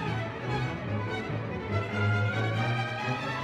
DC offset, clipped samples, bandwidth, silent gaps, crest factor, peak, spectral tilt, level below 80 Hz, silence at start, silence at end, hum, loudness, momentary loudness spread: under 0.1%; under 0.1%; 8.6 kHz; none; 14 dB; -16 dBFS; -6.5 dB/octave; -54 dBFS; 0 s; 0 s; none; -31 LUFS; 5 LU